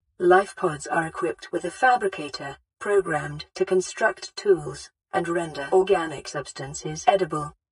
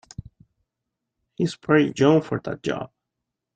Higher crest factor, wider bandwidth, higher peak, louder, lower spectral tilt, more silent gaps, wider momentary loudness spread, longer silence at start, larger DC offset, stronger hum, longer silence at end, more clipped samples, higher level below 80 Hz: about the same, 22 dB vs 20 dB; first, 11 kHz vs 9.2 kHz; about the same, -4 dBFS vs -4 dBFS; about the same, -24 LUFS vs -22 LUFS; second, -4.5 dB/octave vs -6.5 dB/octave; neither; second, 13 LU vs 22 LU; second, 0.2 s vs 1.4 s; neither; neither; second, 0.2 s vs 0.7 s; neither; about the same, -58 dBFS vs -58 dBFS